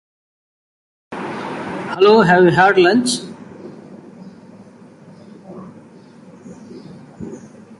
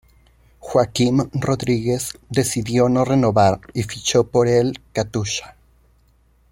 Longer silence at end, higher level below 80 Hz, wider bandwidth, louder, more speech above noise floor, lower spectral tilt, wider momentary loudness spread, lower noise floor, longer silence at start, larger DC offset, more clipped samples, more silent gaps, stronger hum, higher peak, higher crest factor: second, 0.05 s vs 1.05 s; second, -56 dBFS vs -48 dBFS; second, 11.5 kHz vs 16.5 kHz; first, -14 LUFS vs -19 LUFS; second, 31 dB vs 38 dB; about the same, -5 dB/octave vs -5.5 dB/octave; first, 27 LU vs 8 LU; second, -42 dBFS vs -57 dBFS; first, 1.1 s vs 0.65 s; neither; neither; neither; neither; about the same, -2 dBFS vs -2 dBFS; about the same, 18 dB vs 18 dB